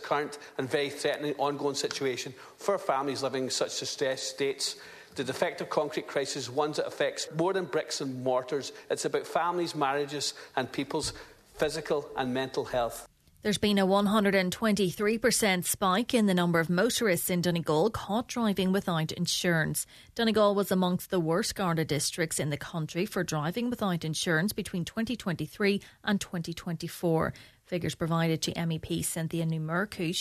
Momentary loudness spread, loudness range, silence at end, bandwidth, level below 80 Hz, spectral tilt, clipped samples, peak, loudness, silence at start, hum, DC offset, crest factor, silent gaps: 9 LU; 5 LU; 0 s; 14 kHz; -60 dBFS; -4.5 dB/octave; under 0.1%; -12 dBFS; -30 LUFS; 0 s; none; under 0.1%; 18 dB; none